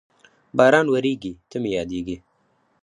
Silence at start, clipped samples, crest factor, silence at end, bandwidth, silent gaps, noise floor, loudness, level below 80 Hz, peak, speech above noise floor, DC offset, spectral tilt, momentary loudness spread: 0.55 s; under 0.1%; 20 dB; 0.65 s; 11 kHz; none; -65 dBFS; -21 LUFS; -54 dBFS; -2 dBFS; 45 dB; under 0.1%; -6 dB/octave; 16 LU